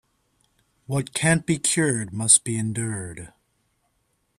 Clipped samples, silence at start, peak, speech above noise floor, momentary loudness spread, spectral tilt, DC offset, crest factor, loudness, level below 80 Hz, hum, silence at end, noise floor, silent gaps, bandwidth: under 0.1%; 0.9 s; -2 dBFS; 48 dB; 15 LU; -3.5 dB/octave; under 0.1%; 24 dB; -21 LUFS; -58 dBFS; none; 1.1 s; -71 dBFS; none; 13.5 kHz